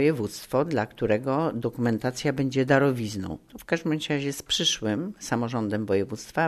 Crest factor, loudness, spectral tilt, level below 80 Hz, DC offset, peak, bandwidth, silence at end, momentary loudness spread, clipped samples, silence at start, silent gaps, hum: 20 dB; -26 LUFS; -5 dB/octave; -56 dBFS; under 0.1%; -6 dBFS; 13.5 kHz; 0 s; 8 LU; under 0.1%; 0 s; none; none